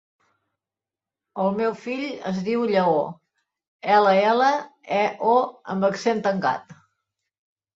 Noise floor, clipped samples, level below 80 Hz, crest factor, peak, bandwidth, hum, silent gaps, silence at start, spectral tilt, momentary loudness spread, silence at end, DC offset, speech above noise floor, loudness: -90 dBFS; under 0.1%; -70 dBFS; 18 dB; -6 dBFS; 7.8 kHz; none; 3.68-3.79 s; 1.35 s; -6 dB/octave; 11 LU; 1 s; under 0.1%; 68 dB; -22 LUFS